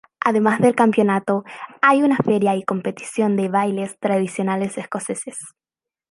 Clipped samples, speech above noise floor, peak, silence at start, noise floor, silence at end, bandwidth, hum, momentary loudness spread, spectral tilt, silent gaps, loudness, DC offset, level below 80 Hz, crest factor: under 0.1%; 70 dB; -2 dBFS; 0.25 s; -89 dBFS; 0.6 s; 11.5 kHz; none; 11 LU; -6 dB/octave; none; -19 LUFS; under 0.1%; -66 dBFS; 18 dB